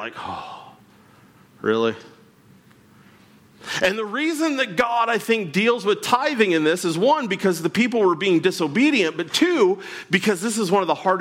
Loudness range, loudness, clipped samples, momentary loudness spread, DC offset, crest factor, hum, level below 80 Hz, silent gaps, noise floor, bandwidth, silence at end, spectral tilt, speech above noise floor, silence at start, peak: 10 LU; -20 LUFS; under 0.1%; 10 LU; under 0.1%; 16 dB; none; -66 dBFS; none; -52 dBFS; 16.5 kHz; 0 s; -4.5 dB/octave; 31 dB; 0 s; -6 dBFS